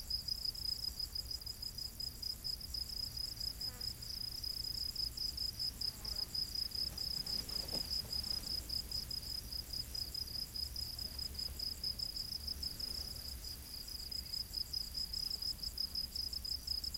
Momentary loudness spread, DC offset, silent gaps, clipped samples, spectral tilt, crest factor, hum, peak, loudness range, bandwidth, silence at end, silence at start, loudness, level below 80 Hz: 4 LU; under 0.1%; none; under 0.1%; -1.5 dB/octave; 16 dB; none; -26 dBFS; 3 LU; 17 kHz; 0 s; 0 s; -40 LUFS; -52 dBFS